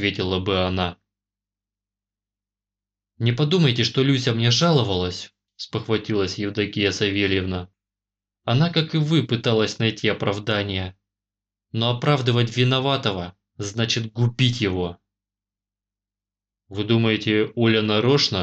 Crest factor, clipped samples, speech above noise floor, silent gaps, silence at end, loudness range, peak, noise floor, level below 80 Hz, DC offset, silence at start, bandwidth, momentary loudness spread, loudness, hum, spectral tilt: 16 dB; under 0.1%; 69 dB; none; 0 s; 5 LU; -6 dBFS; -90 dBFS; -56 dBFS; under 0.1%; 0 s; 8.2 kHz; 12 LU; -21 LUFS; 50 Hz at -45 dBFS; -5.5 dB/octave